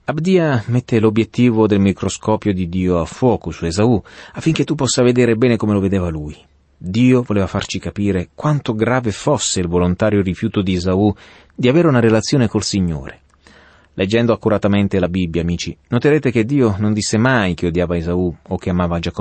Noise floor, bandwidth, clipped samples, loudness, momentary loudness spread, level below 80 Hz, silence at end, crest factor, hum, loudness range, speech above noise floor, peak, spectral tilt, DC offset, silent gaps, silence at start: -47 dBFS; 8.8 kHz; under 0.1%; -17 LUFS; 8 LU; -40 dBFS; 0 s; 14 dB; none; 2 LU; 31 dB; -2 dBFS; -6 dB/octave; under 0.1%; none; 0.1 s